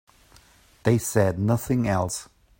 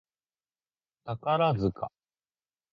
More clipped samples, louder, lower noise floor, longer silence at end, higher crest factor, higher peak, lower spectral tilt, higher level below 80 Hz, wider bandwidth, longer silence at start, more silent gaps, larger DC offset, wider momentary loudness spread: neither; first, -24 LUFS vs -28 LUFS; second, -55 dBFS vs under -90 dBFS; second, 0.35 s vs 0.85 s; about the same, 20 dB vs 18 dB; first, -6 dBFS vs -14 dBFS; second, -6 dB/octave vs -9 dB/octave; first, -50 dBFS vs -58 dBFS; first, 16.5 kHz vs 7 kHz; second, 0.85 s vs 1.05 s; neither; neither; second, 7 LU vs 15 LU